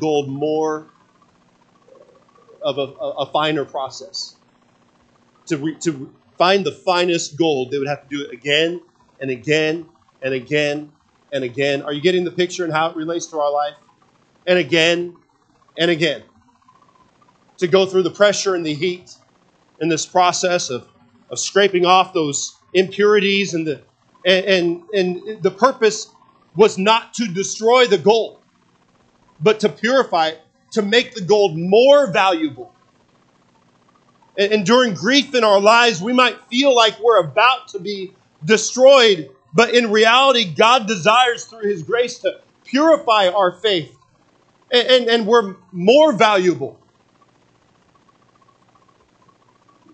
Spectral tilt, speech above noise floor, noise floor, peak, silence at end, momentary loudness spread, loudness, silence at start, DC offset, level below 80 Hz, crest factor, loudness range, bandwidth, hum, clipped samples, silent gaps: -3.5 dB/octave; 41 dB; -58 dBFS; 0 dBFS; 3.25 s; 14 LU; -16 LUFS; 0 s; under 0.1%; -70 dBFS; 18 dB; 8 LU; 9.2 kHz; none; under 0.1%; none